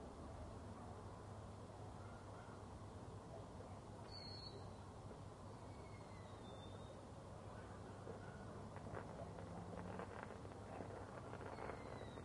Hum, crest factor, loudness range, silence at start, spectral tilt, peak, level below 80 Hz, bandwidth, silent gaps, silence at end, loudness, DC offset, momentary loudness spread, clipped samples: none; 20 dB; 3 LU; 0 s; -6 dB/octave; -34 dBFS; -66 dBFS; 11 kHz; none; 0 s; -55 LUFS; under 0.1%; 5 LU; under 0.1%